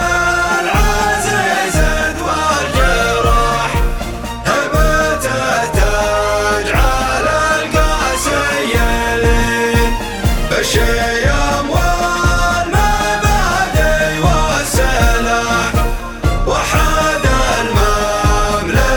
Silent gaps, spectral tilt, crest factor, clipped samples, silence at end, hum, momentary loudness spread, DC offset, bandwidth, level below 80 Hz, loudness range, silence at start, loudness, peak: none; -4 dB/octave; 14 dB; under 0.1%; 0 s; none; 3 LU; under 0.1%; over 20 kHz; -18 dBFS; 1 LU; 0 s; -14 LUFS; 0 dBFS